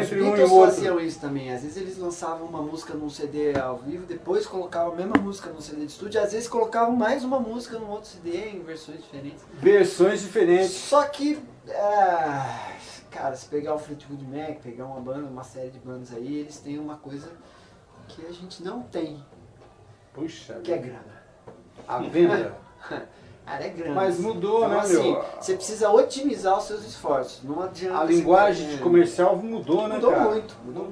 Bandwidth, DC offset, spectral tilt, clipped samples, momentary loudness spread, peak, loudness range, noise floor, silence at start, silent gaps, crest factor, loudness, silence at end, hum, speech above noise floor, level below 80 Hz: 11 kHz; under 0.1%; -5.5 dB/octave; under 0.1%; 18 LU; 0 dBFS; 14 LU; -52 dBFS; 0 s; none; 24 dB; -24 LUFS; 0 s; none; 28 dB; -60 dBFS